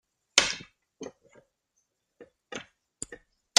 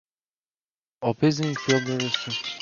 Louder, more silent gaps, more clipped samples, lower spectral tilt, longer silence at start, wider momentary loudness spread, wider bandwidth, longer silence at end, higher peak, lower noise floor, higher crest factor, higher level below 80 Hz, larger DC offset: about the same, -27 LUFS vs -25 LUFS; neither; neither; second, 1 dB/octave vs -4.5 dB/octave; second, 0.35 s vs 1 s; first, 22 LU vs 6 LU; first, 13.5 kHz vs 7.2 kHz; first, 0.45 s vs 0 s; first, -2 dBFS vs -8 dBFS; second, -78 dBFS vs under -90 dBFS; first, 32 dB vs 20 dB; about the same, -66 dBFS vs -66 dBFS; neither